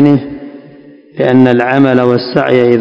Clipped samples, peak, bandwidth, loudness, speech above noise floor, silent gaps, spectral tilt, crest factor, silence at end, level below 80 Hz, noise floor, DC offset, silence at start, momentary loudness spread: 2%; 0 dBFS; 6.4 kHz; -10 LUFS; 28 dB; none; -8.5 dB/octave; 10 dB; 0 s; -50 dBFS; -37 dBFS; under 0.1%; 0 s; 20 LU